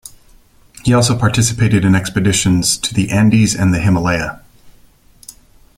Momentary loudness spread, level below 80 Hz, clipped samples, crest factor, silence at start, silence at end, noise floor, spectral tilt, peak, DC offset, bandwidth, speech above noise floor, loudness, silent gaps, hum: 4 LU; -38 dBFS; under 0.1%; 14 dB; 0.85 s; 0.45 s; -47 dBFS; -5 dB/octave; 0 dBFS; under 0.1%; 16 kHz; 34 dB; -14 LUFS; none; none